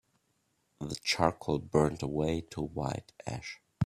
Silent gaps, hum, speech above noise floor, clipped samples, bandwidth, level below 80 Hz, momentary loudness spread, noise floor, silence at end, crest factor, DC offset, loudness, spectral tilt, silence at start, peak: none; none; 44 dB; under 0.1%; 14.5 kHz; -54 dBFS; 13 LU; -76 dBFS; 0 s; 24 dB; under 0.1%; -33 LUFS; -5.5 dB/octave; 0.8 s; -8 dBFS